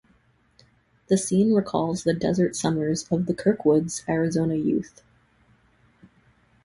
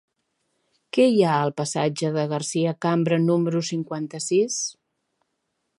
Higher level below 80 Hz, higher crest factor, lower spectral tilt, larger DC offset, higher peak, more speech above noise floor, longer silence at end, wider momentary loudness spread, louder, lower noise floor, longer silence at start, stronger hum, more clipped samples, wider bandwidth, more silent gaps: first, -56 dBFS vs -74 dBFS; about the same, 18 dB vs 18 dB; about the same, -6 dB/octave vs -5.5 dB/octave; neither; about the same, -8 dBFS vs -6 dBFS; second, 39 dB vs 54 dB; first, 1.8 s vs 1.05 s; second, 5 LU vs 9 LU; about the same, -24 LUFS vs -23 LUFS; second, -62 dBFS vs -76 dBFS; first, 1.1 s vs 0.95 s; neither; neither; about the same, 11.5 kHz vs 11.5 kHz; neither